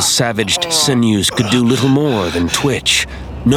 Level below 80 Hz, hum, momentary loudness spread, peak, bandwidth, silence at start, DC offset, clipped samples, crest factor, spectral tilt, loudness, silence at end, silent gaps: -36 dBFS; none; 4 LU; 0 dBFS; 18 kHz; 0 s; under 0.1%; under 0.1%; 14 dB; -3.5 dB/octave; -14 LUFS; 0 s; none